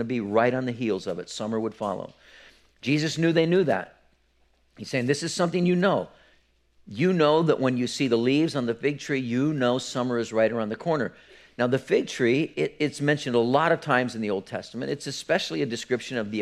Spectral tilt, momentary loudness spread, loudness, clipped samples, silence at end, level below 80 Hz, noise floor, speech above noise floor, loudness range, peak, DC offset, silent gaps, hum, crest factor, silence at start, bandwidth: -5.5 dB/octave; 10 LU; -25 LUFS; under 0.1%; 0 s; -66 dBFS; -65 dBFS; 40 dB; 3 LU; -6 dBFS; under 0.1%; none; none; 20 dB; 0 s; 13 kHz